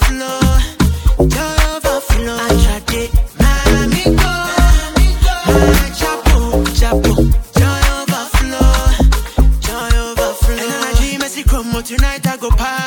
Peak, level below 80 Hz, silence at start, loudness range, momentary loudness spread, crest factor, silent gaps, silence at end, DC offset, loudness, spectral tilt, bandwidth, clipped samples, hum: 0 dBFS; -14 dBFS; 0 s; 3 LU; 5 LU; 12 dB; none; 0 s; under 0.1%; -14 LUFS; -5 dB/octave; 18.5 kHz; under 0.1%; none